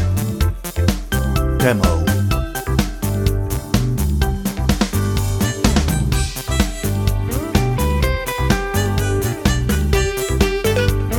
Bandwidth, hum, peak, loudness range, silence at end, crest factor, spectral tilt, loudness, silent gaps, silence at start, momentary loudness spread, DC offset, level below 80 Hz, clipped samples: 19.5 kHz; none; -2 dBFS; 1 LU; 0 s; 16 dB; -5.5 dB/octave; -19 LUFS; none; 0 s; 4 LU; under 0.1%; -22 dBFS; under 0.1%